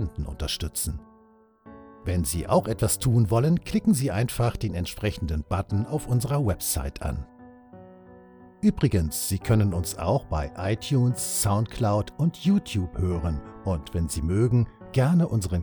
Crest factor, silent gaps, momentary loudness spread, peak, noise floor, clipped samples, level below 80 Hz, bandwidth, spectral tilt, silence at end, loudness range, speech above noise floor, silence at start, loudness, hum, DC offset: 18 dB; none; 9 LU; -8 dBFS; -57 dBFS; under 0.1%; -38 dBFS; 19.5 kHz; -6 dB/octave; 0 s; 4 LU; 33 dB; 0 s; -26 LUFS; none; under 0.1%